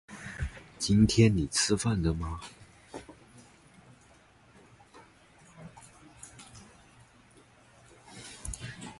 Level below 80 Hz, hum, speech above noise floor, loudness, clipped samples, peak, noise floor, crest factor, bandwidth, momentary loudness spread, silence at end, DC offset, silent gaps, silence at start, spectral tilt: -46 dBFS; none; 34 dB; -28 LUFS; under 0.1%; -10 dBFS; -59 dBFS; 24 dB; 11.5 kHz; 27 LU; 0.05 s; under 0.1%; none; 0.1 s; -5 dB/octave